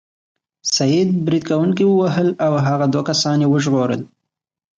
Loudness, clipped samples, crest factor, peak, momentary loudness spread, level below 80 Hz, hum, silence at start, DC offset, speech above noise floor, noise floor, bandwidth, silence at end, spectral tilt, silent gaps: -17 LUFS; under 0.1%; 12 dB; -6 dBFS; 4 LU; -60 dBFS; none; 0.65 s; under 0.1%; 63 dB; -79 dBFS; 9.2 kHz; 0.7 s; -5.5 dB/octave; none